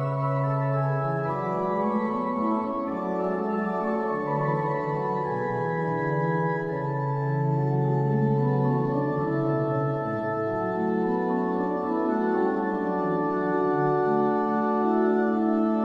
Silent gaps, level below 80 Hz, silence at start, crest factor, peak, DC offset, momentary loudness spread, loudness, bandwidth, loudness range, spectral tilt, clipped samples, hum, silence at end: none; -60 dBFS; 0 s; 14 dB; -12 dBFS; under 0.1%; 4 LU; -26 LUFS; 5.6 kHz; 3 LU; -10.5 dB/octave; under 0.1%; none; 0 s